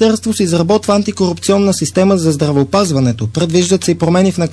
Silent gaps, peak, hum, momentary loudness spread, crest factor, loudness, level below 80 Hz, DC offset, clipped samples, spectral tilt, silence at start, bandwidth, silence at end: none; 0 dBFS; none; 3 LU; 12 dB; -13 LUFS; -46 dBFS; 0.2%; under 0.1%; -5.5 dB/octave; 0 s; 11 kHz; 0 s